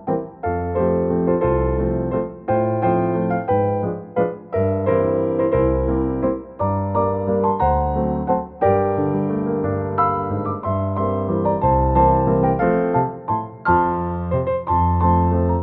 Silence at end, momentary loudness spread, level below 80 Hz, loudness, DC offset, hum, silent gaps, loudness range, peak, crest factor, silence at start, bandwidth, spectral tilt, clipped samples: 0 s; 6 LU; -32 dBFS; -20 LUFS; under 0.1%; none; none; 2 LU; -4 dBFS; 16 dB; 0 s; 4 kHz; -13 dB/octave; under 0.1%